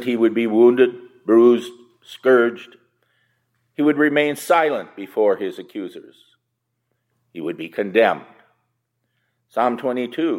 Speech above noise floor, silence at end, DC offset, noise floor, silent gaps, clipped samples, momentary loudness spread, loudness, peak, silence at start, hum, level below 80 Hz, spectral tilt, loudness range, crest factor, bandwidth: 57 dB; 0 s; under 0.1%; -75 dBFS; none; under 0.1%; 18 LU; -18 LUFS; -2 dBFS; 0 s; none; -80 dBFS; -5.5 dB/octave; 7 LU; 18 dB; 15 kHz